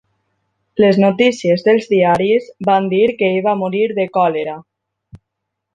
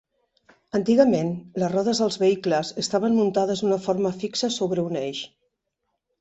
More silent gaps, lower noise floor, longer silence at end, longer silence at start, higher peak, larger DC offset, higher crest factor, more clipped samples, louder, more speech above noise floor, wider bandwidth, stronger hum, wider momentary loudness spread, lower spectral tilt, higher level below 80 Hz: neither; about the same, -77 dBFS vs -78 dBFS; second, 0.6 s vs 0.95 s; about the same, 0.75 s vs 0.75 s; about the same, -2 dBFS vs -4 dBFS; neither; about the same, 14 dB vs 18 dB; neither; first, -15 LUFS vs -23 LUFS; first, 63 dB vs 56 dB; first, 9.6 kHz vs 8.2 kHz; neither; second, 5 LU vs 9 LU; about the same, -6.5 dB/octave vs -5.5 dB/octave; first, -58 dBFS vs -64 dBFS